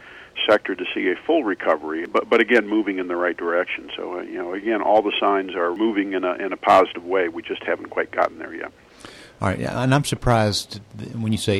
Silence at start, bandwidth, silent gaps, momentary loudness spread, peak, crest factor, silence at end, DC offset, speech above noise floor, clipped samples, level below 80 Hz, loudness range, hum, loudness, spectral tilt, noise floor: 0 s; 14.5 kHz; none; 13 LU; -6 dBFS; 16 dB; 0 s; under 0.1%; 22 dB; under 0.1%; -46 dBFS; 3 LU; none; -21 LUFS; -5.5 dB/octave; -43 dBFS